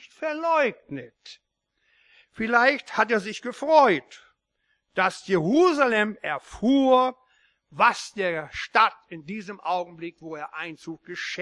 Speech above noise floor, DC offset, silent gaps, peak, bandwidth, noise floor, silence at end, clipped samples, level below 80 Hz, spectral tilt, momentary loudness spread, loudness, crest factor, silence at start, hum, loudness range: 51 dB; under 0.1%; none; -4 dBFS; 11.5 kHz; -75 dBFS; 0 s; under 0.1%; -64 dBFS; -5 dB/octave; 18 LU; -23 LUFS; 20 dB; 0.05 s; none; 4 LU